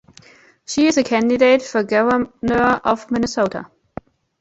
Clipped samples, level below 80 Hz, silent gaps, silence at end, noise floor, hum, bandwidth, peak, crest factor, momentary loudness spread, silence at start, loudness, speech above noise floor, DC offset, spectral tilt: under 0.1%; -48 dBFS; none; 0.75 s; -48 dBFS; none; 8.2 kHz; -2 dBFS; 16 dB; 20 LU; 0.7 s; -17 LUFS; 31 dB; under 0.1%; -4.5 dB/octave